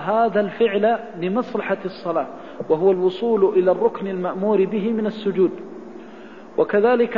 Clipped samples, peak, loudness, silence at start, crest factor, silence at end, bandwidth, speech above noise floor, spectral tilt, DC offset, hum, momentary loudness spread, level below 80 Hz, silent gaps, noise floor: under 0.1%; -6 dBFS; -20 LUFS; 0 s; 14 dB; 0 s; 5.4 kHz; 20 dB; -8.5 dB/octave; 0.4%; none; 17 LU; -62 dBFS; none; -40 dBFS